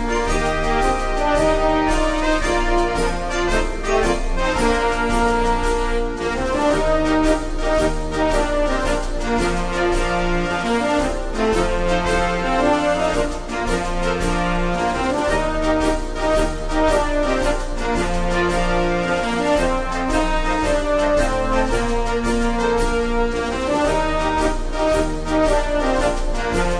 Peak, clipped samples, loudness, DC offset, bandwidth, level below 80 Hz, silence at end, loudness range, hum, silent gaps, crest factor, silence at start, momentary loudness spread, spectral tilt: -4 dBFS; under 0.1%; -20 LUFS; under 0.1%; 11 kHz; -24 dBFS; 0 s; 1 LU; none; none; 14 dB; 0 s; 4 LU; -5 dB/octave